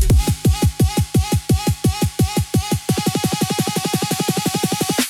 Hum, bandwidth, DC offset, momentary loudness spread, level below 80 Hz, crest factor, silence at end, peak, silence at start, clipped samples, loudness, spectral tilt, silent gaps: none; 18 kHz; under 0.1%; 3 LU; -26 dBFS; 12 dB; 0 s; -6 dBFS; 0 s; under 0.1%; -19 LUFS; -5 dB/octave; none